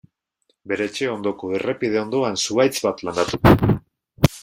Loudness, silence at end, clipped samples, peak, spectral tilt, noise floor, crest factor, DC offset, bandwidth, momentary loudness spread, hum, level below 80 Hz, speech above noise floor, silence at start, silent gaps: -21 LUFS; 0 s; under 0.1%; 0 dBFS; -5.5 dB/octave; -69 dBFS; 20 dB; under 0.1%; 16.5 kHz; 10 LU; none; -38 dBFS; 49 dB; 0.65 s; none